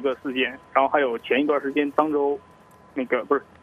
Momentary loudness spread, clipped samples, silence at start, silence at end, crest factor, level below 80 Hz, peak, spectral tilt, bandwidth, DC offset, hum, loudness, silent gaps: 5 LU; under 0.1%; 0 s; 0.2 s; 20 dB; -68 dBFS; -4 dBFS; -6 dB/octave; 6 kHz; under 0.1%; none; -23 LUFS; none